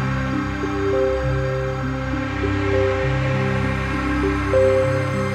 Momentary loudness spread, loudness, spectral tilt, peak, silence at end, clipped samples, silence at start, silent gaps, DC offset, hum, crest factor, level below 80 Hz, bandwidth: 6 LU; -21 LUFS; -7 dB/octave; -6 dBFS; 0 s; under 0.1%; 0 s; none; under 0.1%; none; 14 dB; -32 dBFS; 10 kHz